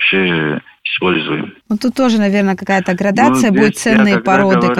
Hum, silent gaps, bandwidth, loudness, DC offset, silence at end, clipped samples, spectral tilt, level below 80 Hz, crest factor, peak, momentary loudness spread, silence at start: none; none; 13.5 kHz; -13 LUFS; under 0.1%; 0 s; under 0.1%; -5.5 dB/octave; -50 dBFS; 12 dB; 0 dBFS; 9 LU; 0 s